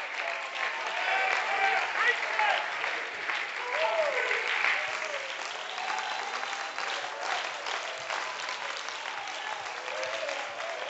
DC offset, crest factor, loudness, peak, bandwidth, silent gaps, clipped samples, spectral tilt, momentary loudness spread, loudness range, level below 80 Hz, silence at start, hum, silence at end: under 0.1%; 20 dB; -30 LUFS; -12 dBFS; 8.2 kHz; none; under 0.1%; 0.5 dB/octave; 9 LU; 6 LU; -84 dBFS; 0 s; none; 0 s